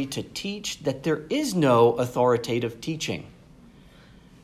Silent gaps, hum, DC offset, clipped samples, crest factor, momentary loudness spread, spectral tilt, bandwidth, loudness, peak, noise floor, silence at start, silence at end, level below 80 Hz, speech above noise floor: none; none; under 0.1%; under 0.1%; 18 dB; 12 LU; -5 dB/octave; 15.5 kHz; -25 LUFS; -6 dBFS; -51 dBFS; 0 s; 1.15 s; -58 dBFS; 27 dB